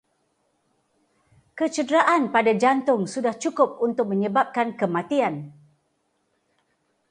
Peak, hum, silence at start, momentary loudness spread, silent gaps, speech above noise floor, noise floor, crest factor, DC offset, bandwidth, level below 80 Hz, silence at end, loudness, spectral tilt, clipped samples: -6 dBFS; none; 1.55 s; 8 LU; none; 49 dB; -71 dBFS; 20 dB; under 0.1%; 10.5 kHz; -74 dBFS; 1.6 s; -22 LUFS; -5.5 dB/octave; under 0.1%